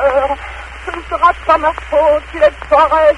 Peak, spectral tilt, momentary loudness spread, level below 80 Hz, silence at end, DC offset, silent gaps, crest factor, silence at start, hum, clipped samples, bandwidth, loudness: 0 dBFS; -5 dB/octave; 14 LU; -34 dBFS; 0 s; under 0.1%; none; 12 dB; 0 s; none; under 0.1%; 11 kHz; -13 LUFS